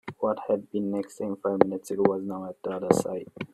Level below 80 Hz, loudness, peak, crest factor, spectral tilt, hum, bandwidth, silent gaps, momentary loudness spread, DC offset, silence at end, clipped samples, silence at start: -68 dBFS; -28 LUFS; -2 dBFS; 26 dB; -6.5 dB/octave; none; 14 kHz; none; 9 LU; under 0.1%; 0.05 s; under 0.1%; 0.05 s